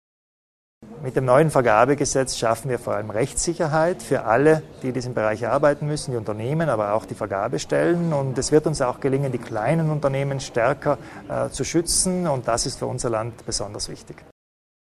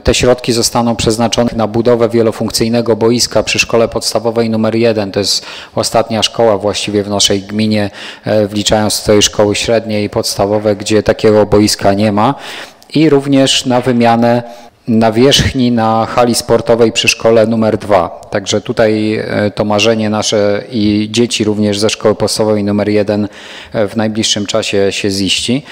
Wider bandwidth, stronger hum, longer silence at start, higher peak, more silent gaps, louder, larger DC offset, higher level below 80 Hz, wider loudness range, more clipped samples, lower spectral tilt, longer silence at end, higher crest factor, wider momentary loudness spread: second, 13.5 kHz vs 16.5 kHz; neither; first, 0.8 s vs 0.05 s; about the same, -2 dBFS vs 0 dBFS; neither; second, -22 LUFS vs -11 LUFS; neither; second, -46 dBFS vs -36 dBFS; about the same, 3 LU vs 2 LU; neither; about the same, -5 dB/octave vs -4 dB/octave; first, 0.75 s vs 0 s; first, 20 dB vs 12 dB; first, 10 LU vs 6 LU